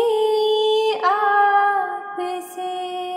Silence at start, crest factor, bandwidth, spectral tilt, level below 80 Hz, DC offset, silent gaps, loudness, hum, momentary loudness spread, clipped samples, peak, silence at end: 0 s; 14 dB; 16 kHz; -1.5 dB/octave; -86 dBFS; under 0.1%; none; -19 LUFS; none; 12 LU; under 0.1%; -6 dBFS; 0 s